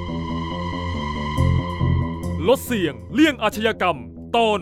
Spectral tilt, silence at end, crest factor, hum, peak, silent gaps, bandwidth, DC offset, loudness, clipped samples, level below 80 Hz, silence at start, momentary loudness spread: -6 dB/octave; 0 s; 16 dB; none; -6 dBFS; none; 16 kHz; under 0.1%; -22 LUFS; under 0.1%; -36 dBFS; 0 s; 8 LU